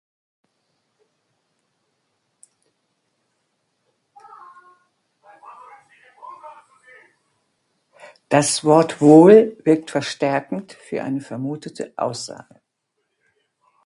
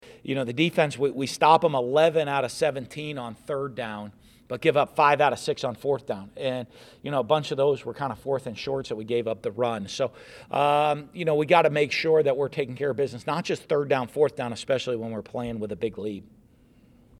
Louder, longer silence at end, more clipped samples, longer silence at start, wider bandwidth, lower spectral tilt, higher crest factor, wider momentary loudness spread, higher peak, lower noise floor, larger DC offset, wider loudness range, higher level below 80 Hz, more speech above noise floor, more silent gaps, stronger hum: first, -17 LUFS vs -25 LUFS; first, 1.5 s vs 1 s; neither; first, 6.25 s vs 0.05 s; second, 11.5 kHz vs 14 kHz; about the same, -5.5 dB/octave vs -5.5 dB/octave; about the same, 22 dB vs 22 dB; first, 25 LU vs 13 LU; first, 0 dBFS vs -4 dBFS; first, -75 dBFS vs -57 dBFS; neither; first, 13 LU vs 5 LU; second, -70 dBFS vs -62 dBFS; first, 58 dB vs 32 dB; neither; neither